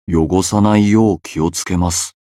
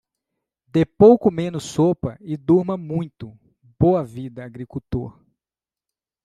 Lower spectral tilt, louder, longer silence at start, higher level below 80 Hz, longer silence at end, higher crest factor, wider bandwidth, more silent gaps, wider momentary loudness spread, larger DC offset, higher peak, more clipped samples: second, -5.5 dB/octave vs -8 dB/octave; first, -15 LUFS vs -19 LUFS; second, 0.1 s vs 0.75 s; first, -34 dBFS vs -48 dBFS; second, 0.15 s vs 1.15 s; second, 14 dB vs 20 dB; first, 14.5 kHz vs 12 kHz; neither; second, 7 LU vs 21 LU; neither; about the same, 0 dBFS vs -2 dBFS; neither